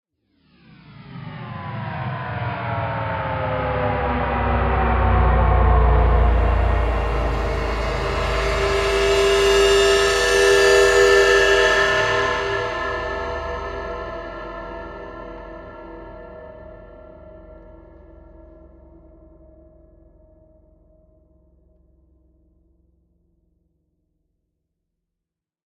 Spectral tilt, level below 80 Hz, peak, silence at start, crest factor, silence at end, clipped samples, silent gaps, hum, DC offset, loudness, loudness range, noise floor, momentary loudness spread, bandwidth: -4.5 dB/octave; -28 dBFS; -2 dBFS; 0.9 s; 18 dB; 7.3 s; under 0.1%; none; none; under 0.1%; -19 LUFS; 20 LU; -85 dBFS; 22 LU; 13.5 kHz